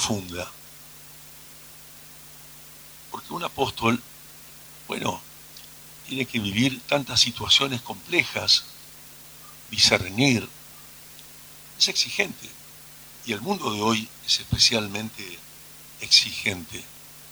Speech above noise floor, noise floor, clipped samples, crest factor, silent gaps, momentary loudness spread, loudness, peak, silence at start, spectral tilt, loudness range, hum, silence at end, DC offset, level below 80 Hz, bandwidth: 21 dB; -46 dBFS; under 0.1%; 24 dB; none; 24 LU; -22 LUFS; -2 dBFS; 0 s; -2.5 dB/octave; 9 LU; none; 0 s; under 0.1%; -54 dBFS; over 20 kHz